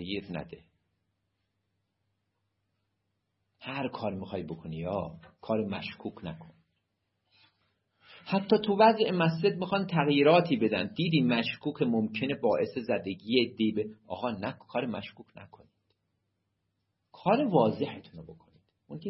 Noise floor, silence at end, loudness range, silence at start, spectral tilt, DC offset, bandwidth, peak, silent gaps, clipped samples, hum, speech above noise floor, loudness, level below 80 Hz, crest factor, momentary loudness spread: -80 dBFS; 0 s; 14 LU; 0 s; -10 dB/octave; under 0.1%; 5.8 kHz; -8 dBFS; none; under 0.1%; none; 51 dB; -29 LUFS; -68 dBFS; 22 dB; 19 LU